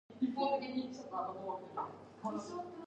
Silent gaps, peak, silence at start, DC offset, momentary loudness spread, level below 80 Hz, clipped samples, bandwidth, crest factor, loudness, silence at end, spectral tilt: none; -22 dBFS; 0.1 s; under 0.1%; 9 LU; -80 dBFS; under 0.1%; 8.8 kHz; 18 dB; -40 LUFS; 0 s; -5.5 dB/octave